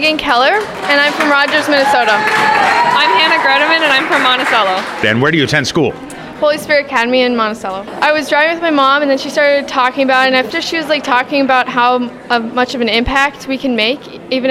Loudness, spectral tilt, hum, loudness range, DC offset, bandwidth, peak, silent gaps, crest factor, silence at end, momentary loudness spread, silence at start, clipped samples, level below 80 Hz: -12 LUFS; -4 dB/octave; none; 4 LU; under 0.1%; 16 kHz; 0 dBFS; none; 12 dB; 0 s; 7 LU; 0 s; under 0.1%; -42 dBFS